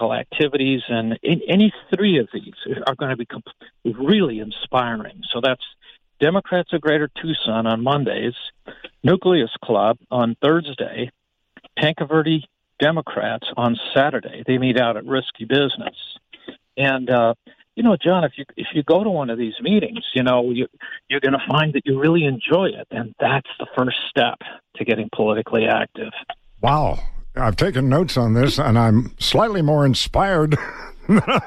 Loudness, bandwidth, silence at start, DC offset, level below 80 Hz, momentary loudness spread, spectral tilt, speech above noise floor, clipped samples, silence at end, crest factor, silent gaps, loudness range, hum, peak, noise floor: -20 LUFS; 13 kHz; 0 s; under 0.1%; -40 dBFS; 13 LU; -6.5 dB/octave; 32 dB; under 0.1%; 0 s; 16 dB; none; 4 LU; none; -4 dBFS; -51 dBFS